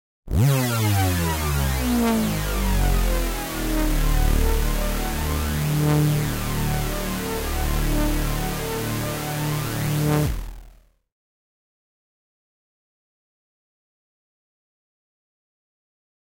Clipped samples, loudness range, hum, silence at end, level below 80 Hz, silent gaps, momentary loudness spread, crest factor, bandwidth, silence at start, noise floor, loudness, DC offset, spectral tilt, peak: under 0.1%; 5 LU; none; 5.55 s; -28 dBFS; none; 6 LU; 14 dB; 17 kHz; 0.25 s; -50 dBFS; -23 LUFS; under 0.1%; -5 dB/octave; -10 dBFS